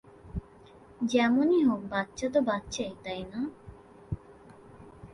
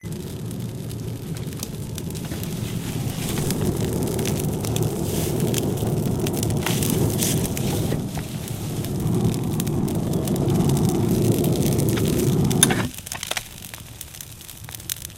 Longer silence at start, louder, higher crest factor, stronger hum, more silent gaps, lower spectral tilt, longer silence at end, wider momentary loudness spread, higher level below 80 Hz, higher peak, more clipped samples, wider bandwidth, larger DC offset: first, 0.25 s vs 0.05 s; second, -29 LUFS vs -23 LUFS; second, 18 dB vs 24 dB; neither; neither; about the same, -5.5 dB/octave vs -5 dB/octave; about the same, 0 s vs 0 s; first, 18 LU vs 11 LU; second, -52 dBFS vs -40 dBFS; second, -12 dBFS vs 0 dBFS; neither; second, 11.5 kHz vs 17 kHz; neither